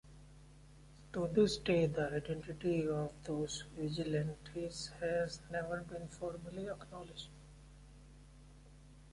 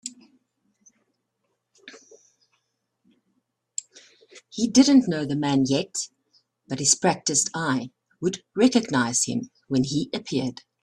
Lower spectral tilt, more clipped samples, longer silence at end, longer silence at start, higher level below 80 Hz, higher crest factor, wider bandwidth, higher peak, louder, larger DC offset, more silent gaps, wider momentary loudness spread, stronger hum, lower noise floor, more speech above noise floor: first, -5.5 dB/octave vs -3.5 dB/octave; neither; second, 0 s vs 0.3 s; about the same, 0.05 s vs 0.05 s; about the same, -60 dBFS vs -64 dBFS; about the same, 20 dB vs 22 dB; about the same, 11.5 kHz vs 12.5 kHz; second, -20 dBFS vs -2 dBFS; second, -39 LUFS vs -23 LUFS; neither; neither; first, 26 LU vs 16 LU; neither; second, -59 dBFS vs -77 dBFS; second, 21 dB vs 54 dB